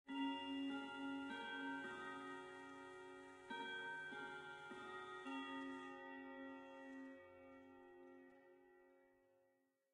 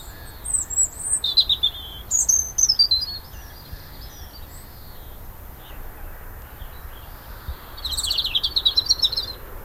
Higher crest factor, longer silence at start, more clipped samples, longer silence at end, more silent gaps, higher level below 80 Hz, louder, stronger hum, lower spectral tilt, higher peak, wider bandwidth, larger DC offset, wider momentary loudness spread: about the same, 18 dB vs 22 dB; about the same, 0.05 s vs 0 s; neither; first, 0.55 s vs 0 s; neither; second, under -90 dBFS vs -40 dBFS; second, -51 LUFS vs -19 LUFS; neither; first, -4 dB/octave vs 0.5 dB/octave; second, -36 dBFS vs -4 dBFS; second, 11 kHz vs 16 kHz; neither; second, 16 LU vs 24 LU